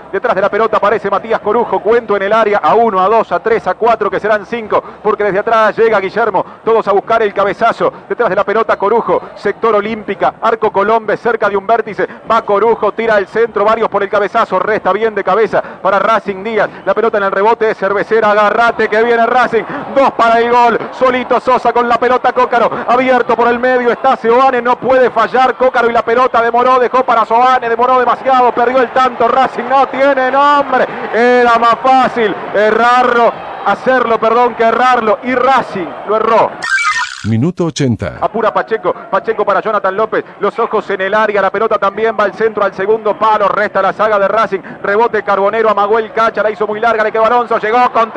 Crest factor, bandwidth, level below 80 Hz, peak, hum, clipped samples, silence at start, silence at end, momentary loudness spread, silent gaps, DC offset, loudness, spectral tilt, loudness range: 12 dB; 9.8 kHz; -48 dBFS; 0 dBFS; none; under 0.1%; 0 s; 0 s; 6 LU; none; under 0.1%; -12 LUFS; -5.5 dB/octave; 3 LU